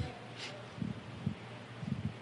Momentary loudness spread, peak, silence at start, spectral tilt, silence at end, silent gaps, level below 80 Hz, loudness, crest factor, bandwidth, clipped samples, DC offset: 5 LU; -22 dBFS; 0 s; -6 dB/octave; 0 s; none; -60 dBFS; -43 LUFS; 20 dB; 11.5 kHz; under 0.1%; under 0.1%